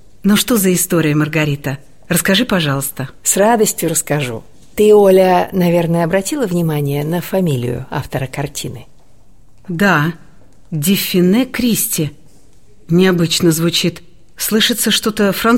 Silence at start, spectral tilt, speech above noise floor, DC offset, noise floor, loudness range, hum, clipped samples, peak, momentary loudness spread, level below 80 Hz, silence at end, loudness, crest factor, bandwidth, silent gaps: 0.25 s; -4.5 dB/octave; 34 dB; 1%; -48 dBFS; 6 LU; none; under 0.1%; 0 dBFS; 11 LU; -44 dBFS; 0 s; -14 LUFS; 14 dB; 16.5 kHz; none